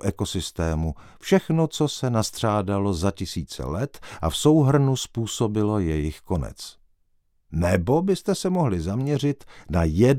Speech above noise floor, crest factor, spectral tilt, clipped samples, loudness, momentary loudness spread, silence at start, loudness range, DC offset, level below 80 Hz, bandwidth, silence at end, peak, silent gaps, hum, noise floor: 42 dB; 18 dB; -6 dB/octave; under 0.1%; -24 LUFS; 11 LU; 0.05 s; 2 LU; under 0.1%; -40 dBFS; 16 kHz; 0 s; -4 dBFS; none; none; -65 dBFS